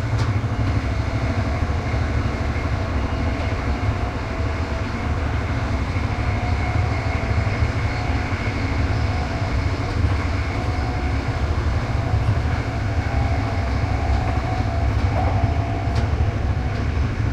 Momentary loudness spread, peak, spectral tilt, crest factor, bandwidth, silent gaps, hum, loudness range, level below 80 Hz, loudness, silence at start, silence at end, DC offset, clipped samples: 3 LU; -6 dBFS; -7 dB/octave; 14 dB; 9 kHz; none; none; 2 LU; -26 dBFS; -23 LUFS; 0 s; 0 s; under 0.1%; under 0.1%